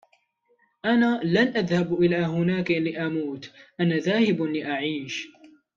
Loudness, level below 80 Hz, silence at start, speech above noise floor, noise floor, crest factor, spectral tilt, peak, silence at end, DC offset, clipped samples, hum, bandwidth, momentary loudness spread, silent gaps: -24 LUFS; -64 dBFS; 0.85 s; 43 dB; -67 dBFS; 16 dB; -6.5 dB/octave; -8 dBFS; 0.3 s; under 0.1%; under 0.1%; none; 7.4 kHz; 11 LU; none